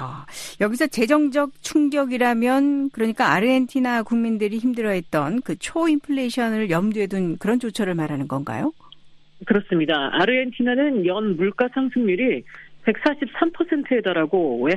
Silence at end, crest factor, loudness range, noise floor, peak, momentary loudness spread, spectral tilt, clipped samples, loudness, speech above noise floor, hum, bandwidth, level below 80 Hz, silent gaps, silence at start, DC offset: 0 s; 18 dB; 4 LU; -46 dBFS; -4 dBFS; 7 LU; -5.5 dB/octave; under 0.1%; -21 LUFS; 25 dB; none; 13.5 kHz; -58 dBFS; none; 0 s; under 0.1%